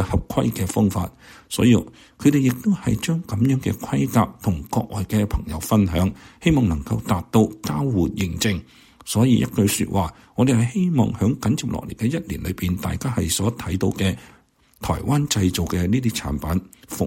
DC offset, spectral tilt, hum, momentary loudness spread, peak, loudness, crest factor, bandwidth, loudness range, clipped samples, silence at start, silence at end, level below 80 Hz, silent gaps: under 0.1%; -6 dB/octave; none; 8 LU; -4 dBFS; -22 LUFS; 18 dB; 16.5 kHz; 3 LU; under 0.1%; 0 s; 0 s; -38 dBFS; none